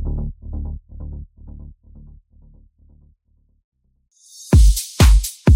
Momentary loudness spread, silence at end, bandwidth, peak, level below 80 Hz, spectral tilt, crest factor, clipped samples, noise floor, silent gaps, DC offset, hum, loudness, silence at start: 26 LU; 0 s; 16.5 kHz; -2 dBFS; -20 dBFS; -5.5 dB/octave; 18 dB; under 0.1%; -61 dBFS; 3.64-3.72 s; under 0.1%; none; -17 LUFS; 0 s